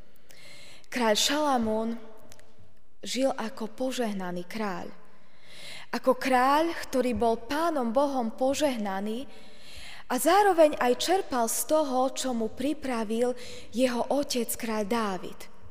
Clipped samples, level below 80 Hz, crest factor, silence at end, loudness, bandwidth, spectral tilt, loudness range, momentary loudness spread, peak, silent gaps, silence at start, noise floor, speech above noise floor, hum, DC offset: under 0.1%; -58 dBFS; 18 dB; 0 s; -27 LUFS; 15.5 kHz; -3.5 dB/octave; 7 LU; 19 LU; -10 dBFS; none; 0.4 s; -60 dBFS; 33 dB; none; 1%